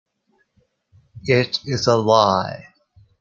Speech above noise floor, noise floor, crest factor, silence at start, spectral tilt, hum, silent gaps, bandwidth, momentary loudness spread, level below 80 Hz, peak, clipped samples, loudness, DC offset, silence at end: 48 dB; -66 dBFS; 20 dB; 1.15 s; -5 dB/octave; none; none; 7.6 kHz; 16 LU; -56 dBFS; -2 dBFS; under 0.1%; -18 LUFS; under 0.1%; 0.6 s